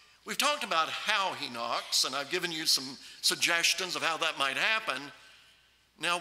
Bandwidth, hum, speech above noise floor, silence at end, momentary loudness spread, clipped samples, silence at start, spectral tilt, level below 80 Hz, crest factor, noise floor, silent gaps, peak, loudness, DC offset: 16 kHz; none; 33 dB; 0 s; 10 LU; under 0.1%; 0.25 s; -0.5 dB/octave; -78 dBFS; 24 dB; -64 dBFS; none; -8 dBFS; -29 LUFS; under 0.1%